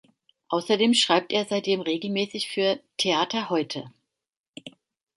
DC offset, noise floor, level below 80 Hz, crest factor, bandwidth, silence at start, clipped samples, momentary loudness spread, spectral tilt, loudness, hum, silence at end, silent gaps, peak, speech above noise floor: under 0.1%; -88 dBFS; -74 dBFS; 20 dB; 11.5 kHz; 0.5 s; under 0.1%; 13 LU; -3.5 dB/octave; -24 LUFS; none; 0.5 s; 4.39-4.53 s; -6 dBFS; 63 dB